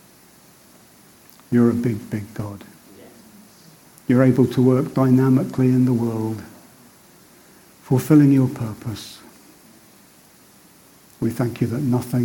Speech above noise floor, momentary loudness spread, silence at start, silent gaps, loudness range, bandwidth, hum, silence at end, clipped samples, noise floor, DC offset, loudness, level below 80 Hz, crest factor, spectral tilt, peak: 32 dB; 17 LU; 1.5 s; none; 8 LU; 17.5 kHz; none; 0 s; under 0.1%; -50 dBFS; under 0.1%; -19 LUFS; -56 dBFS; 18 dB; -8 dB/octave; -2 dBFS